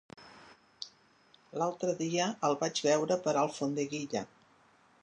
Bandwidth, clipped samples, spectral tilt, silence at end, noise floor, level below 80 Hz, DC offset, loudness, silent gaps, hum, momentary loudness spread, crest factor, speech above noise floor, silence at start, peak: 10 kHz; under 0.1%; -4 dB/octave; 0.75 s; -65 dBFS; -80 dBFS; under 0.1%; -32 LUFS; none; none; 18 LU; 18 dB; 33 dB; 0.2 s; -16 dBFS